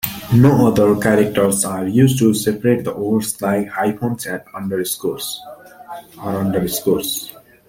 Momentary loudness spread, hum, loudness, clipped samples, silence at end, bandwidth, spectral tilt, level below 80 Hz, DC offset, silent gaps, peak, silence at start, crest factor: 13 LU; none; -17 LUFS; under 0.1%; 0.4 s; 17 kHz; -5.5 dB/octave; -48 dBFS; under 0.1%; none; -2 dBFS; 0.05 s; 16 dB